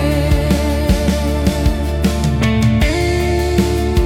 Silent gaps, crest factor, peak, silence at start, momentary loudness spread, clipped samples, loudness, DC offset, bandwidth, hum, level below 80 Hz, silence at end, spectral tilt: none; 12 dB; -2 dBFS; 0 s; 3 LU; under 0.1%; -16 LUFS; under 0.1%; 16.5 kHz; none; -20 dBFS; 0 s; -6 dB/octave